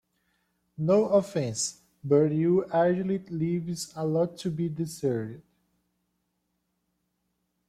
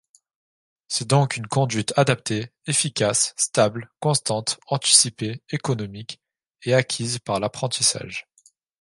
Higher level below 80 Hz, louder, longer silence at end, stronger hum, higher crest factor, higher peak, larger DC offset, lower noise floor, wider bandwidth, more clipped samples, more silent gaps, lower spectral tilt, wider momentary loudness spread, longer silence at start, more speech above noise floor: second, -68 dBFS vs -60 dBFS; second, -27 LUFS vs -21 LUFS; first, 2.3 s vs 0.6 s; neither; second, 18 dB vs 24 dB; second, -10 dBFS vs 0 dBFS; neither; first, -78 dBFS vs -60 dBFS; first, 15 kHz vs 11.5 kHz; neither; neither; first, -6 dB/octave vs -3 dB/octave; second, 9 LU vs 12 LU; about the same, 0.8 s vs 0.9 s; first, 52 dB vs 37 dB